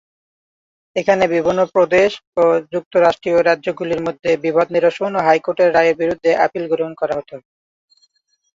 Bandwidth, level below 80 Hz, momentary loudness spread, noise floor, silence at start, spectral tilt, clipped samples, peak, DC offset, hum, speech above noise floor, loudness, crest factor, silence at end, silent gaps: 7.6 kHz; -56 dBFS; 7 LU; -62 dBFS; 0.95 s; -5.5 dB/octave; under 0.1%; -2 dBFS; under 0.1%; none; 46 dB; -16 LUFS; 16 dB; 1.15 s; 2.27-2.32 s, 2.86-2.91 s